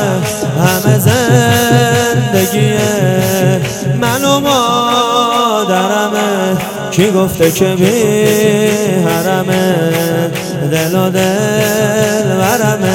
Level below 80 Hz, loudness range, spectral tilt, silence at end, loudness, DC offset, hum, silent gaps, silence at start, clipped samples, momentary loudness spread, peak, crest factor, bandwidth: -44 dBFS; 2 LU; -5 dB/octave; 0 s; -11 LUFS; under 0.1%; none; none; 0 s; 0.2%; 5 LU; 0 dBFS; 12 dB; 17.5 kHz